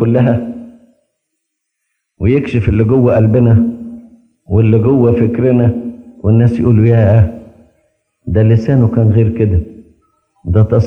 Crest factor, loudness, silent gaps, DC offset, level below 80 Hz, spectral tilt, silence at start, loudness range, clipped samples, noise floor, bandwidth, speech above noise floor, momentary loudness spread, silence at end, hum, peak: 12 dB; -11 LUFS; none; under 0.1%; -36 dBFS; -11 dB/octave; 0 s; 3 LU; under 0.1%; -72 dBFS; 3.8 kHz; 62 dB; 17 LU; 0 s; none; 0 dBFS